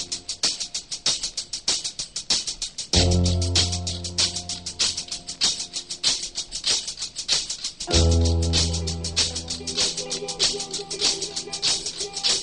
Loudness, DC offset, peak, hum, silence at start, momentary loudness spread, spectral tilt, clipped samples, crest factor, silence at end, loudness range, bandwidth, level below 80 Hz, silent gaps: -23 LUFS; 0.2%; -6 dBFS; none; 0 s; 8 LU; -2.5 dB/octave; under 0.1%; 20 dB; 0 s; 1 LU; 11.5 kHz; -32 dBFS; none